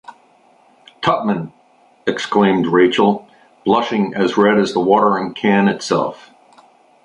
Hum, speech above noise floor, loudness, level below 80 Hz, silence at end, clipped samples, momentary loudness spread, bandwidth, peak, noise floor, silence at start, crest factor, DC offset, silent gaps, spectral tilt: none; 37 dB; -16 LUFS; -58 dBFS; 0.9 s; under 0.1%; 10 LU; 9.6 kHz; 0 dBFS; -52 dBFS; 1 s; 16 dB; under 0.1%; none; -6 dB/octave